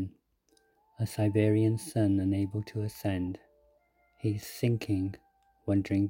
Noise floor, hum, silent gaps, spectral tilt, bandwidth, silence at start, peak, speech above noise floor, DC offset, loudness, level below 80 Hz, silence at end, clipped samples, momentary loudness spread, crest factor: -70 dBFS; none; none; -7.5 dB/octave; 17 kHz; 0 s; -12 dBFS; 41 dB; under 0.1%; -31 LUFS; -62 dBFS; 0 s; under 0.1%; 12 LU; 18 dB